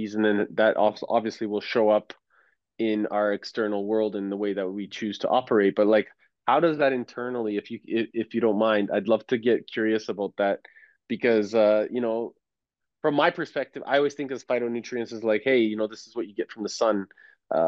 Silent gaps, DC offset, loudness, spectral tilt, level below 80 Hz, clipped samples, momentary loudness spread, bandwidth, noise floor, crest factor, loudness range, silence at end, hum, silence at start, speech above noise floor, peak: none; under 0.1%; -25 LUFS; -5.5 dB/octave; -78 dBFS; under 0.1%; 10 LU; 7.8 kHz; -86 dBFS; 18 dB; 3 LU; 0 s; none; 0 s; 61 dB; -8 dBFS